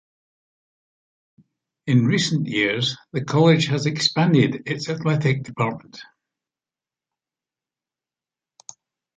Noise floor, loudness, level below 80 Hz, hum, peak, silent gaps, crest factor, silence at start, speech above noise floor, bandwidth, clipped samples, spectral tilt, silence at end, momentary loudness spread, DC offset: under -90 dBFS; -20 LUFS; -62 dBFS; none; -4 dBFS; none; 20 dB; 1.85 s; over 70 dB; 9.4 kHz; under 0.1%; -5.5 dB/octave; 3.15 s; 10 LU; under 0.1%